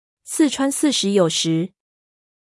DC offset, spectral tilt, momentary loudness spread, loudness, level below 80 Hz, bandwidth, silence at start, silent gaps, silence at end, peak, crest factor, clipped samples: under 0.1%; -4 dB/octave; 8 LU; -19 LUFS; -70 dBFS; 12 kHz; 0.25 s; none; 0.9 s; -4 dBFS; 16 dB; under 0.1%